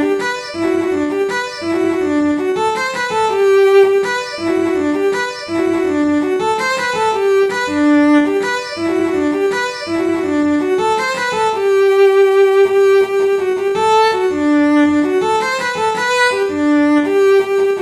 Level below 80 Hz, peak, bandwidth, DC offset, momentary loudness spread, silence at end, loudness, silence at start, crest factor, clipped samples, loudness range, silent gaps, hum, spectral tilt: -54 dBFS; -2 dBFS; 12.5 kHz; under 0.1%; 7 LU; 0 s; -14 LUFS; 0 s; 12 dB; under 0.1%; 4 LU; none; none; -4 dB/octave